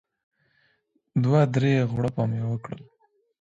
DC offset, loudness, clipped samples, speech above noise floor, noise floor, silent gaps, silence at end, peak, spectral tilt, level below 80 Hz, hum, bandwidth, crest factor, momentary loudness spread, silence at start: under 0.1%; -24 LUFS; under 0.1%; 46 dB; -69 dBFS; none; 0.65 s; -8 dBFS; -8.5 dB/octave; -58 dBFS; none; 7.8 kHz; 18 dB; 13 LU; 1.15 s